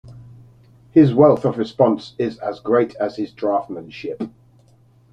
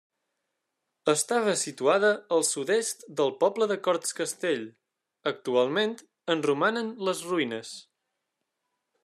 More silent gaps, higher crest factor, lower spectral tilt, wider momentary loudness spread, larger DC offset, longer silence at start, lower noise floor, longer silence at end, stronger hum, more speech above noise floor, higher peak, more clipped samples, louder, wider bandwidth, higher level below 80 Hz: neither; about the same, 18 dB vs 18 dB; first, -9 dB/octave vs -3 dB/octave; first, 17 LU vs 9 LU; neither; second, 0.05 s vs 1.05 s; second, -53 dBFS vs -82 dBFS; second, 0.85 s vs 1.2 s; neither; second, 35 dB vs 56 dB; first, -2 dBFS vs -10 dBFS; neither; first, -18 LUFS vs -27 LUFS; second, 7.4 kHz vs 13.5 kHz; first, -58 dBFS vs -84 dBFS